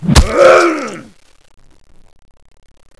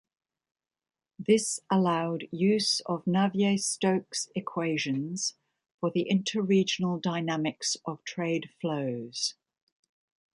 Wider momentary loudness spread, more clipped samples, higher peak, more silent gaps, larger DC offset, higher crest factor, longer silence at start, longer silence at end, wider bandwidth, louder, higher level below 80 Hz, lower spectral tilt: first, 20 LU vs 8 LU; first, 0.4% vs under 0.1%; first, 0 dBFS vs -10 dBFS; second, none vs 5.74-5.78 s; neither; second, 14 dB vs 20 dB; second, 0 s vs 1.2 s; first, 2 s vs 1 s; about the same, 11 kHz vs 11.5 kHz; first, -9 LUFS vs -29 LUFS; first, -22 dBFS vs -74 dBFS; about the same, -5 dB/octave vs -4.5 dB/octave